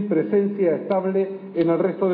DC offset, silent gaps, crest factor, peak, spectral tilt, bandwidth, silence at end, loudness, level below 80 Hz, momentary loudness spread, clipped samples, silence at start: under 0.1%; none; 12 dB; -10 dBFS; -12 dB/octave; 4.8 kHz; 0 s; -22 LUFS; -68 dBFS; 4 LU; under 0.1%; 0 s